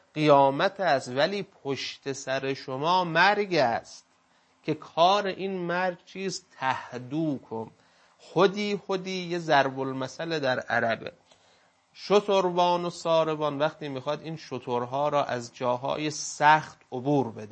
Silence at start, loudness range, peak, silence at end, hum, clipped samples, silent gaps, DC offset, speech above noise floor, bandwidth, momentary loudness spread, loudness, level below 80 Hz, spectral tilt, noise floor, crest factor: 0.15 s; 4 LU; -6 dBFS; 0 s; none; under 0.1%; none; under 0.1%; 38 dB; 8.8 kHz; 12 LU; -27 LUFS; -74 dBFS; -4.5 dB/octave; -65 dBFS; 22 dB